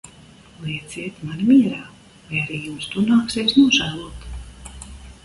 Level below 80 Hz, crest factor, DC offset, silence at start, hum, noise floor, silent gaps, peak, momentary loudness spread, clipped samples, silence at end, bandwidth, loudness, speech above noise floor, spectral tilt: -44 dBFS; 18 dB; under 0.1%; 0.05 s; none; -46 dBFS; none; -4 dBFS; 22 LU; under 0.1%; 0.1 s; 11.5 kHz; -19 LUFS; 27 dB; -4.5 dB/octave